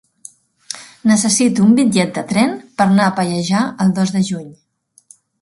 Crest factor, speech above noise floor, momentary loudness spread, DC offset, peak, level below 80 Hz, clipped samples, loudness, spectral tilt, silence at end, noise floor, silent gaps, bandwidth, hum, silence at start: 16 dB; 35 dB; 10 LU; under 0.1%; 0 dBFS; -58 dBFS; under 0.1%; -15 LUFS; -5 dB/octave; 0.9 s; -49 dBFS; none; 11.5 kHz; none; 0.7 s